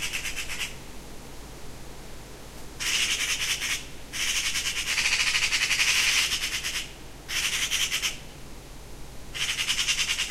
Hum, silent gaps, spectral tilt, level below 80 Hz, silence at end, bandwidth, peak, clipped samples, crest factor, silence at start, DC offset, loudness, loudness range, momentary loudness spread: none; none; 0.5 dB/octave; -44 dBFS; 0 s; 16 kHz; -10 dBFS; under 0.1%; 20 dB; 0 s; under 0.1%; -25 LUFS; 6 LU; 22 LU